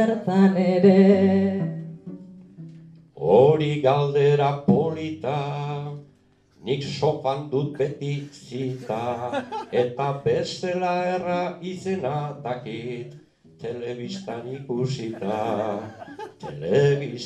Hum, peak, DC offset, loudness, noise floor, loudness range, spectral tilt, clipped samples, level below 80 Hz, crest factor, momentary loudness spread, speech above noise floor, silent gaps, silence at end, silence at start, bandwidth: none; -4 dBFS; under 0.1%; -23 LUFS; -58 dBFS; 9 LU; -7.5 dB/octave; under 0.1%; -64 dBFS; 18 dB; 18 LU; 36 dB; none; 0 s; 0 s; 8.6 kHz